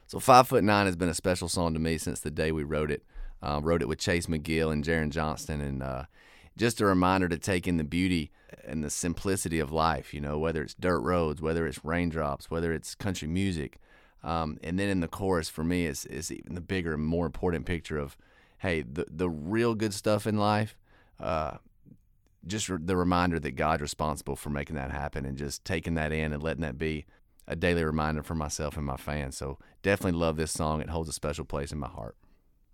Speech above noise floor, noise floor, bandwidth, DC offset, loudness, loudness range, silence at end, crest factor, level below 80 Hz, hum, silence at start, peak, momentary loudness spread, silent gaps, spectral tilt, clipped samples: 34 dB; -63 dBFS; 17.5 kHz; under 0.1%; -30 LUFS; 3 LU; 0.65 s; 26 dB; -44 dBFS; none; 0.1 s; -4 dBFS; 10 LU; none; -5.5 dB/octave; under 0.1%